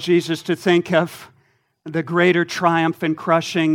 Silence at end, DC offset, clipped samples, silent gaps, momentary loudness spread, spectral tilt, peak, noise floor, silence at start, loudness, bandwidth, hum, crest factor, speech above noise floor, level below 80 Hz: 0 s; under 0.1%; under 0.1%; none; 10 LU; -5.5 dB/octave; -2 dBFS; -61 dBFS; 0 s; -19 LUFS; 15.5 kHz; none; 18 dB; 43 dB; -68 dBFS